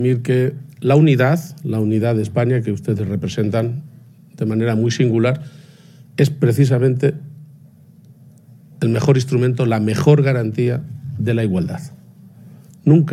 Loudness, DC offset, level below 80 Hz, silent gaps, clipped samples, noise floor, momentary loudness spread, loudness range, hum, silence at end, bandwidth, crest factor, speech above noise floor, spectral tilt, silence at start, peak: -17 LUFS; under 0.1%; -56 dBFS; none; under 0.1%; -45 dBFS; 12 LU; 3 LU; none; 0 s; 14 kHz; 18 dB; 29 dB; -7.5 dB/octave; 0 s; 0 dBFS